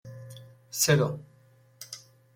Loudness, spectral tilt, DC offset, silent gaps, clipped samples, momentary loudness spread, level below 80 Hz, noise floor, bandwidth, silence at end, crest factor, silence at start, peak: -26 LUFS; -4 dB/octave; under 0.1%; none; under 0.1%; 24 LU; -64 dBFS; -60 dBFS; 16.5 kHz; 0.4 s; 22 dB; 0.05 s; -10 dBFS